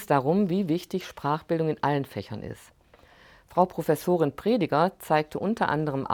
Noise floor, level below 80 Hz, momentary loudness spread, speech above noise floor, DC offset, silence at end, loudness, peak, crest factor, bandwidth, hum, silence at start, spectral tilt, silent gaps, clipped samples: -56 dBFS; -60 dBFS; 11 LU; 30 dB; under 0.1%; 0 s; -26 LUFS; -6 dBFS; 20 dB; 20 kHz; none; 0 s; -7 dB/octave; none; under 0.1%